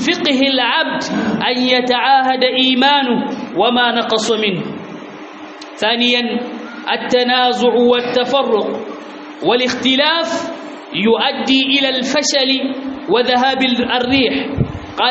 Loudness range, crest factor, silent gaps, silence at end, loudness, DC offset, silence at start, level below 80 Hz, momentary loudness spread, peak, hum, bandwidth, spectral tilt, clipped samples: 3 LU; 14 dB; none; 0 s; -14 LUFS; under 0.1%; 0 s; -48 dBFS; 14 LU; -2 dBFS; none; 8 kHz; -1.5 dB/octave; under 0.1%